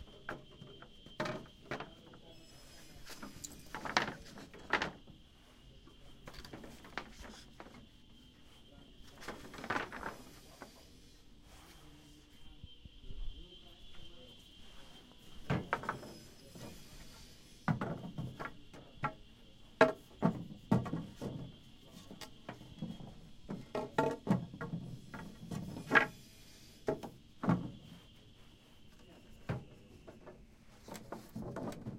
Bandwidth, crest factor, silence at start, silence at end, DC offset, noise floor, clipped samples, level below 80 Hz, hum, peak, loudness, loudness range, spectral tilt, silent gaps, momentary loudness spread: 16 kHz; 34 dB; 0 s; 0 s; under 0.1%; -60 dBFS; under 0.1%; -58 dBFS; none; -8 dBFS; -40 LUFS; 16 LU; -5.5 dB/octave; none; 24 LU